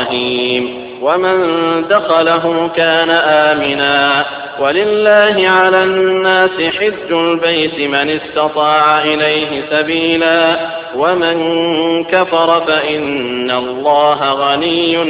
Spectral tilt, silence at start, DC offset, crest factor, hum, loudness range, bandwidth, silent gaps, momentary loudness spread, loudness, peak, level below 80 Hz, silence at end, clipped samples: -8 dB/octave; 0 s; under 0.1%; 12 dB; none; 2 LU; 4 kHz; none; 6 LU; -12 LUFS; 0 dBFS; -52 dBFS; 0 s; under 0.1%